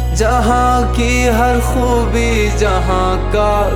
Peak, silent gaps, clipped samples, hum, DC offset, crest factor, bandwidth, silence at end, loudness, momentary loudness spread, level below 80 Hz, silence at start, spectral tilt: 0 dBFS; none; under 0.1%; none; under 0.1%; 12 dB; 16 kHz; 0 s; -14 LUFS; 3 LU; -18 dBFS; 0 s; -5.5 dB/octave